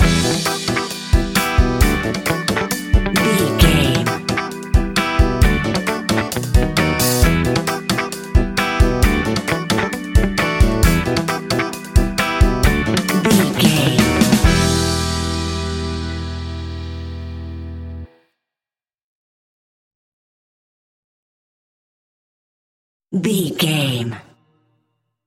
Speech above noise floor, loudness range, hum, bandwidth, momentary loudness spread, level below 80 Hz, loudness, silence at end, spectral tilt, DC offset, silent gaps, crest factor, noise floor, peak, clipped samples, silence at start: over 71 dB; 13 LU; none; 17 kHz; 12 LU; -24 dBFS; -17 LUFS; 1.05 s; -5 dB/octave; under 0.1%; 19.03-23.00 s; 18 dB; under -90 dBFS; 0 dBFS; under 0.1%; 0 s